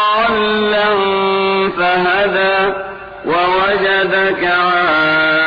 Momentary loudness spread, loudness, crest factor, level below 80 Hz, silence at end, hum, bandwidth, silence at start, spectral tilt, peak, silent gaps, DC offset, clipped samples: 4 LU; -13 LUFS; 10 dB; -46 dBFS; 0 s; none; 5.2 kHz; 0 s; -6.5 dB/octave; -4 dBFS; none; under 0.1%; under 0.1%